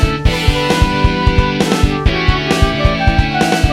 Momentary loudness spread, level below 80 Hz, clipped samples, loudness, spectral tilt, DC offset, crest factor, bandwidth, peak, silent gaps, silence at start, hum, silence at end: 1 LU; -18 dBFS; 0.1%; -14 LUFS; -5.5 dB/octave; under 0.1%; 12 dB; 15.5 kHz; 0 dBFS; none; 0 s; none; 0 s